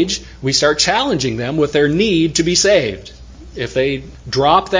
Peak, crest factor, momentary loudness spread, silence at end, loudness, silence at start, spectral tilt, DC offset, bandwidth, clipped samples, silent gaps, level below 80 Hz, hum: 0 dBFS; 16 dB; 11 LU; 0 s; -15 LUFS; 0 s; -3.5 dB/octave; under 0.1%; 7.8 kHz; under 0.1%; none; -38 dBFS; none